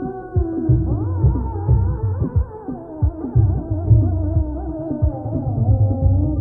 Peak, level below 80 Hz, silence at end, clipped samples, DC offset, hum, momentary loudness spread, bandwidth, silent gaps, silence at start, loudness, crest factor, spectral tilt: -4 dBFS; -24 dBFS; 0 s; under 0.1%; under 0.1%; none; 8 LU; 1.7 kHz; none; 0 s; -20 LUFS; 14 dB; -15 dB/octave